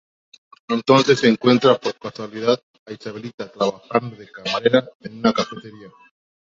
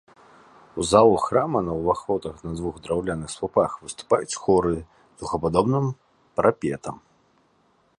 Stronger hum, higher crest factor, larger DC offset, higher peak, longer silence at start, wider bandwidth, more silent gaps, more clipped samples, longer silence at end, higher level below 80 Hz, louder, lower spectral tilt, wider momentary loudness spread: neither; about the same, 18 dB vs 22 dB; neither; about the same, -2 dBFS vs -4 dBFS; about the same, 0.7 s vs 0.75 s; second, 7.8 kHz vs 11.5 kHz; first, 2.63-2.86 s, 3.34-3.38 s, 4.95-5.00 s vs none; neither; second, 0.6 s vs 1.05 s; second, -62 dBFS vs -48 dBFS; first, -19 LUFS vs -23 LUFS; about the same, -5.5 dB/octave vs -6 dB/octave; first, 18 LU vs 14 LU